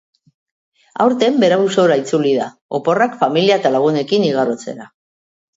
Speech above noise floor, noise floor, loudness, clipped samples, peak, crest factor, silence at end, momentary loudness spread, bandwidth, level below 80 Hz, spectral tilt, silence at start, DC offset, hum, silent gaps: over 75 dB; under -90 dBFS; -15 LUFS; under 0.1%; 0 dBFS; 16 dB; 0.7 s; 10 LU; 8 kHz; -68 dBFS; -5.5 dB/octave; 0.95 s; under 0.1%; none; 2.61-2.69 s